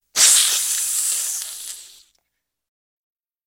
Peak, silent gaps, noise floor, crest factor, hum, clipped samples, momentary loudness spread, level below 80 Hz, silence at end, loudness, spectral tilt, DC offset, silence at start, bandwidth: -2 dBFS; none; -78 dBFS; 20 dB; none; under 0.1%; 20 LU; -70 dBFS; 1.6 s; -16 LUFS; 4.5 dB/octave; under 0.1%; 0.15 s; 17 kHz